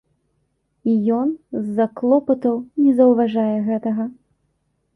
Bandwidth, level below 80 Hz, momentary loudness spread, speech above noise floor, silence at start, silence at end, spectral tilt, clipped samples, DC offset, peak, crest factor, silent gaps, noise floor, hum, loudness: 3.8 kHz; -64 dBFS; 10 LU; 51 dB; 0.85 s; 0.85 s; -9.5 dB/octave; under 0.1%; under 0.1%; -4 dBFS; 16 dB; none; -69 dBFS; none; -19 LUFS